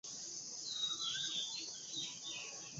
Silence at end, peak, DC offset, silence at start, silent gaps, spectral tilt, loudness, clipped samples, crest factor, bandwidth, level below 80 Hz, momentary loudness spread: 0 s; -28 dBFS; under 0.1%; 0.05 s; none; 0.5 dB/octave; -40 LUFS; under 0.1%; 16 dB; 8 kHz; -86 dBFS; 7 LU